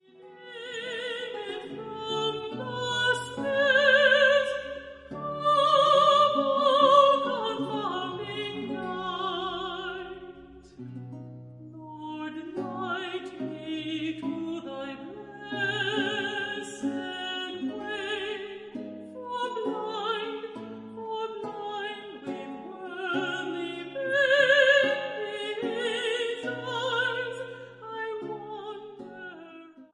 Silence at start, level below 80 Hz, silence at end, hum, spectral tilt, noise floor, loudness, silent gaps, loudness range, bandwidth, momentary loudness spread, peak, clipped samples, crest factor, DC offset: 0.2 s; -68 dBFS; 0.1 s; none; -4 dB/octave; -49 dBFS; -27 LUFS; none; 13 LU; 11 kHz; 21 LU; -8 dBFS; under 0.1%; 20 dB; under 0.1%